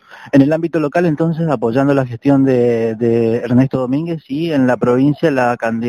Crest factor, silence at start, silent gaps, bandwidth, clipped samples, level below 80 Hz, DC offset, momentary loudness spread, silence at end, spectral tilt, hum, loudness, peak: 14 dB; 0.1 s; none; 10.5 kHz; under 0.1%; -52 dBFS; under 0.1%; 5 LU; 0 s; -8.5 dB/octave; none; -15 LUFS; 0 dBFS